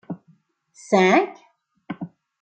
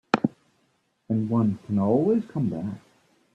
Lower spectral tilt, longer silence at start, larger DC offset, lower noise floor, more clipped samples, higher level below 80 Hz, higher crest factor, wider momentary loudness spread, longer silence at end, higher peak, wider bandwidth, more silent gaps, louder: second, -5.5 dB/octave vs -8.5 dB/octave; about the same, 0.1 s vs 0.15 s; neither; second, -60 dBFS vs -69 dBFS; neither; second, -72 dBFS vs -64 dBFS; about the same, 20 dB vs 24 dB; first, 21 LU vs 11 LU; second, 0.35 s vs 0.55 s; about the same, -4 dBFS vs -2 dBFS; first, 9 kHz vs 8 kHz; neither; first, -19 LUFS vs -25 LUFS